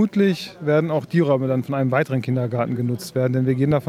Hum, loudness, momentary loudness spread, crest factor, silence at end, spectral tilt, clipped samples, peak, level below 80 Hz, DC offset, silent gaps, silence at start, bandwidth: none; -21 LUFS; 4 LU; 14 dB; 0 s; -7.5 dB/octave; under 0.1%; -6 dBFS; -56 dBFS; under 0.1%; none; 0 s; 15 kHz